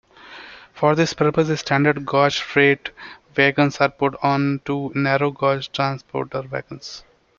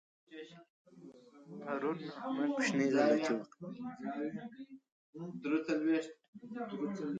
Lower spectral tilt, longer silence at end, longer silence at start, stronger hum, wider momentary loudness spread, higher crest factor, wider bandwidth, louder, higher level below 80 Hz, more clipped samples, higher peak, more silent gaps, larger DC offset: about the same, -5.5 dB/octave vs -5.5 dB/octave; first, 0.4 s vs 0 s; about the same, 0.25 s vs 0.3 s; neither; second, 18 LU vs 23 LU; about the same, 18 dB vs 20 dB; second, 7.4 kHz vs 9.2 kHz; first, -20 LUFS vs -36 LUFS; first, -56 dBFS vs -84 dBFS; neither; first, -2 dBFS vs -16 dBFS; second, none vs 0.70-0.85 s, 4.92-5.13 s, 6.28-6.33 s; neither